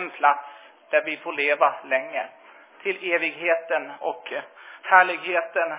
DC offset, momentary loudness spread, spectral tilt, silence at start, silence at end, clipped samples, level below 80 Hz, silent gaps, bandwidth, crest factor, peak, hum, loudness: under 0.1%; 16 LU; -6 dB/octave; 0 s; 0 s; under 0.1%; under -90 dBFS; none; 4 kHz; 22 dB; -2 dBFS; none; -23 LUFS